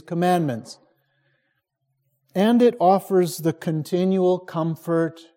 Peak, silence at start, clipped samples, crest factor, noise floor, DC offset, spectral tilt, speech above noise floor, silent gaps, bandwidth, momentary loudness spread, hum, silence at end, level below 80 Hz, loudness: -6 dBFS; 0.1 s; under 0.1%; 16 dB; -74 dBFS; under 0.1%; -7 dB/octave; 53 dB; none; 16.5 kHz; 10 LU; none; 0.15 s; -70 dBFS; -21 LUFS